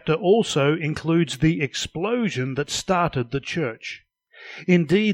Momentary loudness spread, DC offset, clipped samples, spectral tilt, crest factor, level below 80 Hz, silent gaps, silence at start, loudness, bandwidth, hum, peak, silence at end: 12 LU; under 0.1%; under 0.1%; -5.5 dB/octave; 18 dB; -48 dBFS; none; 0.05 s; -22 LUFS; 14 kHz; none; -6 dBFS; 0 s